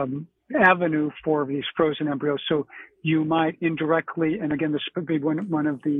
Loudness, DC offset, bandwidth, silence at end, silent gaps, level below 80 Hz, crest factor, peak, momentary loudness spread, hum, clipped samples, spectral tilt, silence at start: -24 LUFS; under 0.1%; 3.9 kHz; 0 s; none; -62 dBFS; 20 dB; -4 dBFS; 8 LU; none; under 0.1%; -9 dB/octave; 0 s